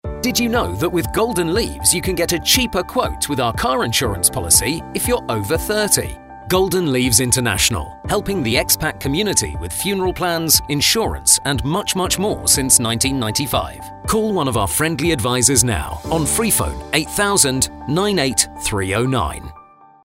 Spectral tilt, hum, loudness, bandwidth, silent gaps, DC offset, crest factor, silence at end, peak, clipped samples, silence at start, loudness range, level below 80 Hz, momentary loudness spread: -3 dB/octave; none; -17 LUFS; 16.5 kHz; none; under 0.1%; 18 dB; 0.45 s; 0 dBFS; under 0.1%; 0.05 s; 2 LU; -34 dBFS; 8 LU